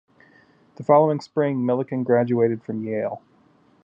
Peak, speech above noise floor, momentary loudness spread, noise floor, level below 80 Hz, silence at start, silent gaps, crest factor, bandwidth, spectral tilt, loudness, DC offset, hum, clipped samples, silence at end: -4 dBFS; 37 dB; 12 LU; -58 dBFS; -74 dBFS; 0.8 s; none; 20 dB; 7.6 kHz; -9 dB/octave; -22 LUFS; under 0.1%; none; under 0.1%; 0.65 s